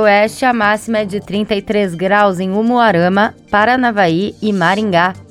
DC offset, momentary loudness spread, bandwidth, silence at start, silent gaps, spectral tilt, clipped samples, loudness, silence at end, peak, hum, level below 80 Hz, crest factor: under 0.1%; 6 LU; 14.5 kHz; 0 s; none; -6 dB/octave; under 0.1%; -14 LUFS; 0.05 s; 0 dBFS; none; -48 dBFS; 14 dB